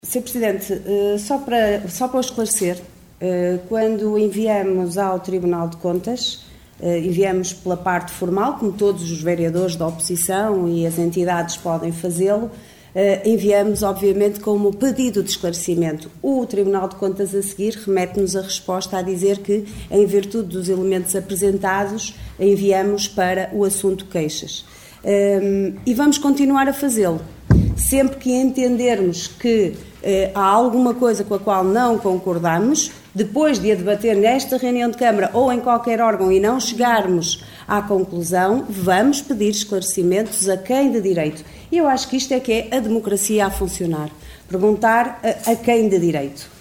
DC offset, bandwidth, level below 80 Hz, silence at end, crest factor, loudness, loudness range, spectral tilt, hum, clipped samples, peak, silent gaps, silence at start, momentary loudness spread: under 0.1%; 19 kHz; -40 dBFS; 0.1 s; 18 dB; -19 LUFS; 3 LU; -4.5 dB/octave; none; under 0.1%; 0 dBFS; none; 0.05 s; 7 LU